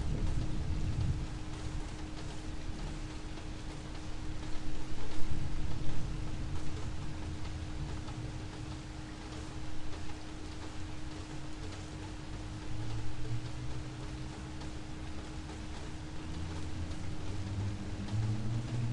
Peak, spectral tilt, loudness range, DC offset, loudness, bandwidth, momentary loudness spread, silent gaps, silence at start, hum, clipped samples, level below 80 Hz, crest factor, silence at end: -14 dBFS; -6 dB/octave; 4 LU; under 0.1%; -42 LUFS; 11 kHz; 8 LU; none; 0 s; none; under 0.1%; -42 dBFS; 18 dB; 0 s